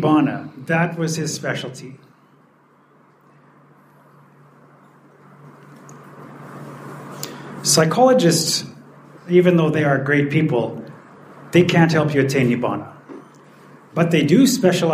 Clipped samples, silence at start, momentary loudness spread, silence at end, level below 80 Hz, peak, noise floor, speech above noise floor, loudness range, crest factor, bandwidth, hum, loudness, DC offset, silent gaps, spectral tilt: under 0.1%; 0 s; 23 LU; 0 s; -64 dBFS; -2 dBFS; -54 dBFS; 37 dB; 14 LU; 18 dB; 15.5 kHz; none; -17 LUFS; under 0.1%; none; -5 dB/octave